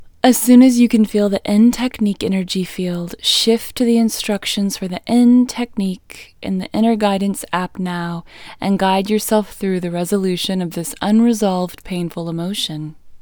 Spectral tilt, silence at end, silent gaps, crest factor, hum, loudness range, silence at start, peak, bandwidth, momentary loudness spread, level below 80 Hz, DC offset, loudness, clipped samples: -5 dB/octave; 0.05 s; none; 16 dB; none; 5 LU; 0 s; 0 dBFS; over 20 kHz; 12 LU; -48 dBFS; under 0.1%; -17 LUFS; under 0.1%